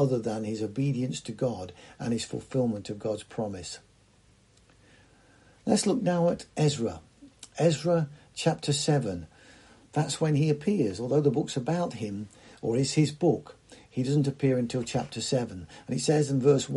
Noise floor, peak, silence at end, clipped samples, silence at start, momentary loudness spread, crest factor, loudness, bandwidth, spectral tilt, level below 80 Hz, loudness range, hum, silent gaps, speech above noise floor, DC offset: -61 dBFS; -10 dBFS; 0 s; under 0.1%; 0 s; 12 LU; 20 dB; -28 LUFS; 11.5 kHz; -6 dB/octave; -62 dBFS; 6 LU; none; none; 34 dB; under 0.1%